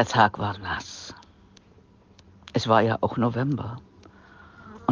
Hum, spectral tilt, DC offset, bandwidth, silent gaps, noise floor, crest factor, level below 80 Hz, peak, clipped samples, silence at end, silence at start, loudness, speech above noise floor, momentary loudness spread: none; -6 dB/octave; under 0.1%; 9.8 kHz; none; -55 dBFS; 22 dB; -56 dBFS; -4 dBFS; under 0.1%; 0 s; 0 s; -25 LUFS; 31 dB; 19 LU